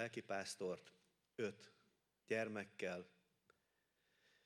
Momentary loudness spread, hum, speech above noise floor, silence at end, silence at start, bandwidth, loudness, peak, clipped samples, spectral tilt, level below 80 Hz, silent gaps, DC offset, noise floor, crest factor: 18 LU; none; 38 dB; 1.35 s; 0 s; 14 kHz; -47 LUFS; -30 dBFS; under 0.1%; -4 dB/octave; under -90 dBFS; none; under 0.1%; -85 dBFS; 20 dB